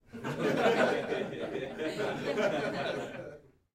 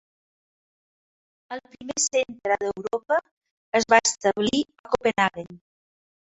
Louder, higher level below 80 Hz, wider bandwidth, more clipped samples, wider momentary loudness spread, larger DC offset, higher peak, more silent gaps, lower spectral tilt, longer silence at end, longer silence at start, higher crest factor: second, -32 LUFS vs -24 LUFS; about the same, -66 dBFS vs -62 dBFS; first, 16 kHz vs 8.4 kHz; neither; second, 12 LU vs 19 LU; neither; second, -16 dBFS vs -2 dBFS; second, none vs 3.31-3.41 s, 3.51-3.72 s, 4.79-4.84 s; first, -5 dB/octave vs -2.5 dB/octave; second, 0.35 s vs 0.75 s; second, 0.15 s vs 1.5 s; second, 18 dB vs 24 dB